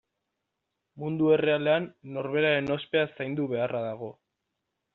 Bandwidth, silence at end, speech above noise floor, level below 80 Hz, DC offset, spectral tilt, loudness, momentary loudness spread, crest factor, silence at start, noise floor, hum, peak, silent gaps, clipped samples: 4.3 kHz; 0.8 s; 56 dB; -70 dBFS; under 0.1%; -4.5 dB/octave; -27 LUFS; 13 LU; 18 dB; 0.95 s; -83 dBFS; none; -12 dBFS; none; under 0.1%